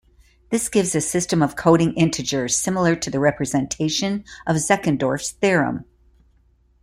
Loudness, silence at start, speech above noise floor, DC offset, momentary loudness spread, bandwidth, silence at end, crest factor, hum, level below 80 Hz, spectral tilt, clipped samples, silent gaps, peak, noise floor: -20 LUFS; 0.5 s; 38 dB; under 0.1%; 7 LU; 15.5 kHz; 1 s; 18 dB; none; -50 dBFS; -4.5 dB/octave; under 0.1%; none; -2 dBFS; -58 dBFS